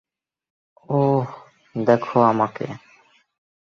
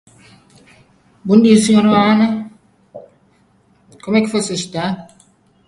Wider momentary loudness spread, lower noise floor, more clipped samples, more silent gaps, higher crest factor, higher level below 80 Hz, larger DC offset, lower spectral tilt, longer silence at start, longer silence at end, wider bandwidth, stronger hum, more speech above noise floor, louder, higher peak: second, 16 LU vs 19 LU; about the same, -56 dBFS vs -55 dBFS; neither; neither; about the same, 20 dB vs 16 dB; second, -64 dBFS vs -56 dBFS; neither; first, -9 dB/octave vs -5.5 dB/octave; second, 0.9 s vs 1.25 s; first, 0.9 s vs 0.65 s; second, 7 kHz vs 11.5 kHz; neither; second, 37 dB vs 42 dB; second, -20 LUFS vs -14 LUFS; about the same, -2 dBFS vs 0 dBFS